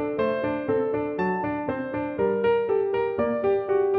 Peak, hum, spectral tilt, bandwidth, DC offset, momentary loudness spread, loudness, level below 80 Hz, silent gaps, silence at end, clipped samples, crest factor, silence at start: -12 dBFS; none; -9.5 dB/octave; 4.8 kHz; under 0.1%; 5 LU; -25 LUFS; -56 dBFS; none; 0 s; under 0.1%; 12 dB; 0 s